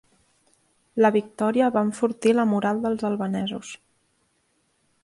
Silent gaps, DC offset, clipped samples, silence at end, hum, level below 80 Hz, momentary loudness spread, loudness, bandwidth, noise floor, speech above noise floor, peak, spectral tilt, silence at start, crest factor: none; under 0.1%; under 0.1%; 1.3 s; none; -66 dBFS; 13 LU; -23 LUFS; 11.5 kHz; -69 dBFS; 46 dB; -8 dBFS; -6 dB/octave; 0.95 s; 16 dB